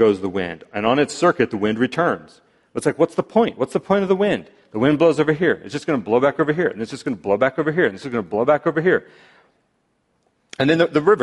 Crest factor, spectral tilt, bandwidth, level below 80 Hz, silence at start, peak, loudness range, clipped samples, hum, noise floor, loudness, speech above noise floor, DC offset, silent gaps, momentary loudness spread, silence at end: 16 dB; -6 dB/octave; 11.5 kHz; -58 dBFS; 0 s; -4 dBFS; 2 LU; under 0.1%; none; -67 dBFS; -20 LUFS; 48 dB; under 0.1%; none; 10 LU; 0 s